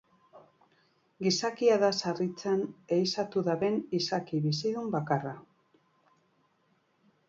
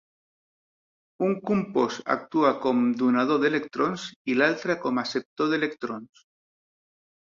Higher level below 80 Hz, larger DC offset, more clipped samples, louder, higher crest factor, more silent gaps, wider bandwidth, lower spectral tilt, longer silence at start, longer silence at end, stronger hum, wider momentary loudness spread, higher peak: second, -74 dBFS vs -68 dBFS; neither; neither; second, -30 LUFS vs -25 LUFS; about the same, 18 dB vs 20 dB; second, none vs 4.16-4.25 s, 5.25-5.36 s; about the same, 7.8 kHz vs 7.4 kHz; about the same, -5 dB/octave vs -5.5 dB/octave; second, 0.35 s vs 1.2 s; first, 1.85 s vs 1.35 s; neither; about the same, 7 LU vs 7 LU; second, -14 dBFS vs -8 dBFS